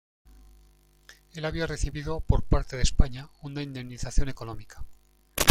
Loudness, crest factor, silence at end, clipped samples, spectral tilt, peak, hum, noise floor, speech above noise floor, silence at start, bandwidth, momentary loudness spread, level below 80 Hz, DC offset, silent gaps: -31 LUFS; 26 dB; 0 s; under 0.1%; -4.5 dB/octave; 0 dBFS; 50 Hz at -45 dBFS; -59 dBFS; 33 dB; 1.1 s; 16.5 kHz; 17 LU; -32 dBFS; under 0.1%; none